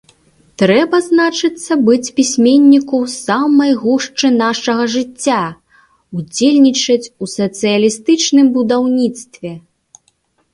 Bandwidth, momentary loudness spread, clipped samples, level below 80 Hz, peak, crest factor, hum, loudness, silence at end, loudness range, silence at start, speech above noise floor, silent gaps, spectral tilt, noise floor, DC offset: 11.5 kHz; 10 LU; under 0.1%; -58 dBFS; 0 dBFS; 14 dB; none; -13 LUFS; 0.95 s; 3 LU; 0.6 s; 47 dB; none; -4 dB/octave; -60 dBFS; under 0.1%